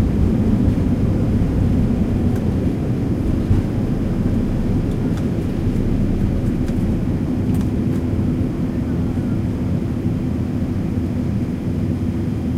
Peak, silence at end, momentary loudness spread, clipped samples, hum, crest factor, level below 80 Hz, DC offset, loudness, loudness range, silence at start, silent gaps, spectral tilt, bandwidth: -6 dBFS; 0 s; 4 LU; under 0.1%; none; 14 dB; -26 dBFS; under 0.1%; -20 LUFS; 3 LU; 0 s; none; -9 dB/octave; 14 kHz